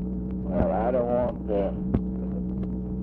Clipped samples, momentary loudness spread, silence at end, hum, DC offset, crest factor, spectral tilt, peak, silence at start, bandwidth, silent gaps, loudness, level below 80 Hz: under 0.1%; 7 LU; 0 s; none; under 0.1%; 18 dB; -12 dB/octave; -8 dBFS; 0 s; 3.6 kHz; none; -27 LUFS; -36 dBFS